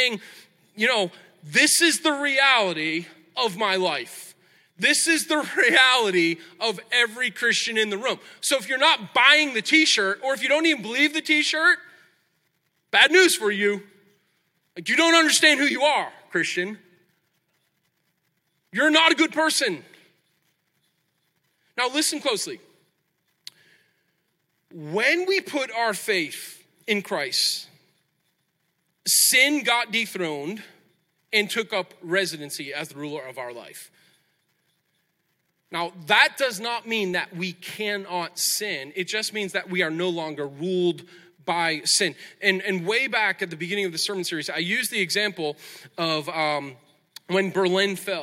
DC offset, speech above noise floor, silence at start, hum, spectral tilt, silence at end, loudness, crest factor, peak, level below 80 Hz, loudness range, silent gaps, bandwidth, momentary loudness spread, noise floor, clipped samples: under 0.1%; 50 dB; 0 s; none; -2 dB/octave; 0 s; -21 LUFS; 22 dB; -2 dBFS; -82 dBFS; 9 LU; none; 16.5 kHz; 15 LU; -73 dBFS; under 0.1%